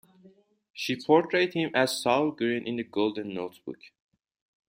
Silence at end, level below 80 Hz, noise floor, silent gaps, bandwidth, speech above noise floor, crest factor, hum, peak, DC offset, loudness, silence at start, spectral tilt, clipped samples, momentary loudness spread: 0.8 s; -74 dBFS; -59 dBFS; 0.70-0.74 s; 16 kHz; 32 dB; 22 dB; none; -8 dBFS; under 0.1%; -27 LUFS; 0.25 s; -4.5 dB/octave; under 0.1%; 18 LU